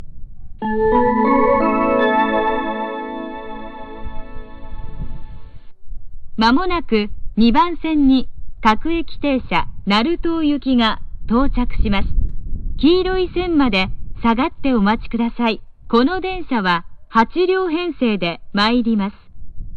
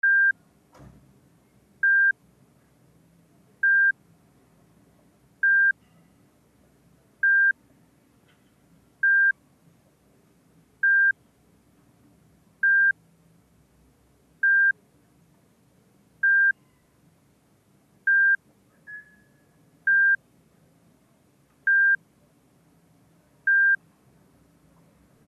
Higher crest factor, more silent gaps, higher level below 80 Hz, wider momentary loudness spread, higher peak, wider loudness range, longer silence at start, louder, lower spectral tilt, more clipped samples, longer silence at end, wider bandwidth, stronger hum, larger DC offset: about the same, 16 dB vs 12 dB; neither; first, -28 dBFS vs -72 dBFS; about the same, 17 LU vs 15 LU; first, -2 dBFS vs -16 dBFS; first, 6 LU vs 3 LU; about the same, 0 s vs 0.05 s; first, -18 LUFS vs -21 LUFS; first, -7 dB/octave vs -4 dB/octave; neither; second, 0 s vs 1.5 s; first, 7 kHz vs 2.4 kHz; neither; neither